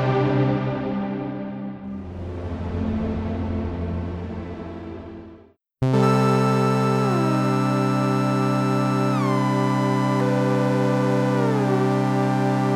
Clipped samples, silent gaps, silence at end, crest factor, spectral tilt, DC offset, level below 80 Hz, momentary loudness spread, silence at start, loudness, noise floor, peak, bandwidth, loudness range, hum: under 0.1%; none; 0 s; 14 dB; -7.5 dB/octave; under 0.1%; -44 dBFS; 13 LU; 0 s; -22 LUFS; -50 dBFS; -8 dBFS; 12.5 kHz; 8 LU; none